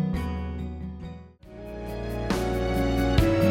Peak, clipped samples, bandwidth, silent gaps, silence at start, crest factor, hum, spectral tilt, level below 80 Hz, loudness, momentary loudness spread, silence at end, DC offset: -10 dBFS; under 0.1%; 16.5 kHz; none; 0 s; 18 dB; none; -7 dB/octave; -34 dBFS; -28 LUFS; 19 LU; 0 s; under 0.1%